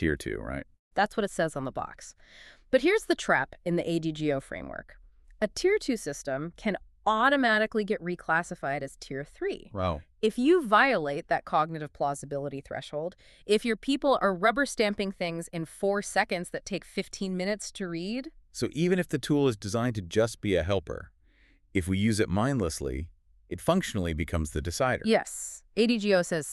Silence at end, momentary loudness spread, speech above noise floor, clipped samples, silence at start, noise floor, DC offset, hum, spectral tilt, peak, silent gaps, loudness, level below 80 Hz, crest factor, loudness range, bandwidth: 0 s; 12 LU; 33 dB; under 0.1%; 0 s; -62 dBFS; under 0.1%; none; -5 dB/octave; -8 dBFS; 0.79-0.91 s; -29 LUFS; -50 dBFS; 20 dB; 4 LU; 13.5 kHz